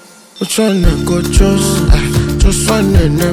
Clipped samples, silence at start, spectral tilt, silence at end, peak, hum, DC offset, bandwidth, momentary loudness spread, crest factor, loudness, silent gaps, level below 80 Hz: 1%; 0.35 s; -5 dB/octave; 0 s; 0 dBFS; none; under 0.1%; 18 kHz; 4 LU; 10 dB; -12 LUFS; none; -16 dBFS